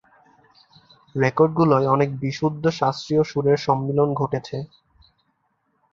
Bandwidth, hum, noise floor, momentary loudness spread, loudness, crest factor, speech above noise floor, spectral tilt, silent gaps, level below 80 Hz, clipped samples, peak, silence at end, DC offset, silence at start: 7.4 kHz; none; -70 dBFS; 11 LU; -21 LUFS; 20 dB; 49 dB; -7.5 dB/octave; none; -58 dBFS; under 0.1%; -4 dBFS; 1.3 s; under 0.1%; 1.15 s